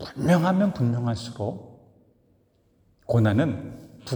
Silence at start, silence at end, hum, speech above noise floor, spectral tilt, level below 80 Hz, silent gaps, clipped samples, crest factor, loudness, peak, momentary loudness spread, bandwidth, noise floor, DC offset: 0 s; 0 s; none; 41 dB; -7.5 dB/octave; -58 dBFS; none; under 0.1%; 18 dB; -24 LUFS; -8 dBFS; 20 LU; over 20 kHz; -64 dBFS; under 0.1%